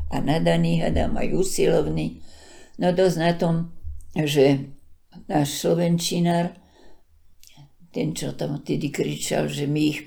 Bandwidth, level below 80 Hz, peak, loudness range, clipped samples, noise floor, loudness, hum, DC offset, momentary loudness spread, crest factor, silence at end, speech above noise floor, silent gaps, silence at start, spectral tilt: 20 kHz; -40 dBFS; -6 dBFS; 5 LU; under 0.1%; -50 dBFS; -23 LUFS; none; under 0.1%; 9 LU; 18 dB; 0 s; 28 dB; none; 0 s; -5.5 dB/octave